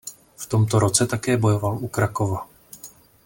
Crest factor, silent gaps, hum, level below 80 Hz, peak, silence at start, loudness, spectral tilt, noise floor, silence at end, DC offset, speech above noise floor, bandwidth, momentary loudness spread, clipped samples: 18 dB; none; none; -52 dBFS; -4 dBFS; 0.05 s; -22 LUFS; -5 dB/octave; -46 dBFS; 0.35 s; under 0.1%; 25 dB; 17 kHz; 22 LU; under 0.1%